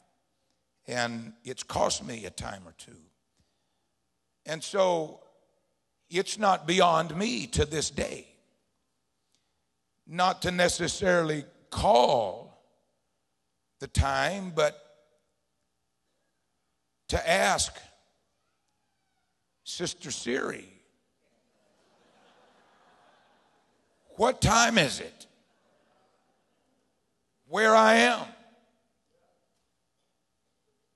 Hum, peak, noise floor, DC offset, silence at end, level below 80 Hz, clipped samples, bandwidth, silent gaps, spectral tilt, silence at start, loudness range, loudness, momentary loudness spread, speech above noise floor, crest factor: none; -6 dBFS; -80 dBFS; under 0.1%; 2.6 s; -48 dBFS; under 0.1%; 12.5 kHz; none; -3.5 dB/octave; 0.9 s; 11 LU; -26 LUFS; 18 LU; 53 dB; 24 dB